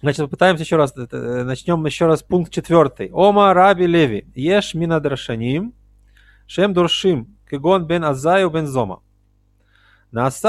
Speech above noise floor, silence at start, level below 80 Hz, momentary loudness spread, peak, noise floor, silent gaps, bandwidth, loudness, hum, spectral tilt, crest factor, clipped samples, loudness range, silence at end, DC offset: 41 dB; 0.05 s; -48 dBFS; 11 LU; 0 dBFS; -58 dBFS; none; 13 kHz; -17 LUFS; 50 Hz at -45 dBFS; -6 dB/octave; 16 dB; under 0.1%; 5 LU; 0 s; under 0.1%